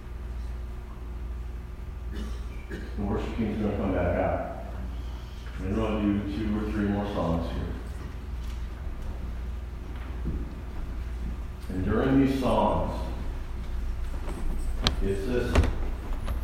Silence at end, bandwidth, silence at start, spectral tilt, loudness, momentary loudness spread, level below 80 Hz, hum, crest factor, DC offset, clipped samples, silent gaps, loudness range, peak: 0 s; 14.5 kHz; 0 s; -7 dB/octave; -31 LUFS; 13 LU; -34 dBFS; none; 26 dB; under 0.1%; under 0.1%; none; 8 LU; -4 dBFS